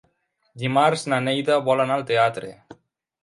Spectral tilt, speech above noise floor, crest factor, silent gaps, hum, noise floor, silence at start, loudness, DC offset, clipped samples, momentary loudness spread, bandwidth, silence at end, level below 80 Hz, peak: -5 dB/octave; 48 dB; 18 dB; none; none; -69 dBFS; 0.55 s; -21 LUFS; under 0.1%; under 0.1%; 10 LU; 11.5 kHz; 0.5 s; -68 dBFS; -4 dBFS